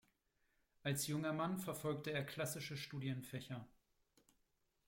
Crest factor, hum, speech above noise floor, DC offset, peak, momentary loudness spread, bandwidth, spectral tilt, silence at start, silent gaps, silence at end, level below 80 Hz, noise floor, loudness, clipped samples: 18 dB; none; 39 dB; under 0.1%; -28 dBFS; 8 LU; 16.5 kHz; -4.5 dB/octave; 0.85 s; none; 1.2 s; -78 dBFS; -82 dBFS; -44 LUFS; under 0.1%